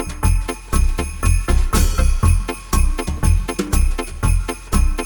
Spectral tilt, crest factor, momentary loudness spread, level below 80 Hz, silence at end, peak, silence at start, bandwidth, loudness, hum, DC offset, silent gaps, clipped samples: -5 dB/octave; 12 dB; 5 LU; -18 dBFS; 0 s; -4 dBFS; 0 s; 20 kHz; -20 LUFS; none; under 0.1%; none; under 0.1%